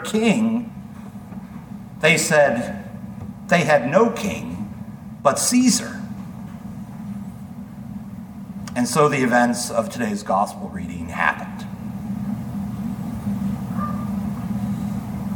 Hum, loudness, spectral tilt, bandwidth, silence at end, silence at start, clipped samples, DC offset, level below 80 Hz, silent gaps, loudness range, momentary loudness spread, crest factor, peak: none; -21 LUFS; -4.5 dB/octave; 19 kHz; 0 s; 0 s; under 0.1%; under 0.1%; -48 dBFS; none; 7 LU; 19 LU; 20 dB; -2 dBFS